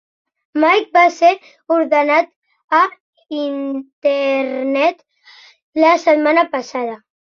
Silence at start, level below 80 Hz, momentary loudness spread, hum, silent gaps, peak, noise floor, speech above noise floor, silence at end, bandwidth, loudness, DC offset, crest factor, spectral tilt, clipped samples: 0.55 s; -70 dBFS; 13 LU; none; 2.36-2.42 s, 2.64-2.68 s, 3.00-3.13 s, 3.93-4.02 s, 5.62-5.73 s; -2 dBFS; -46 dBFS; 31 dB; 0.3 s; 7.2 kHz; -16 LUFS; under 0.1%; 16 dB; -3 dB/octave; under 0.1%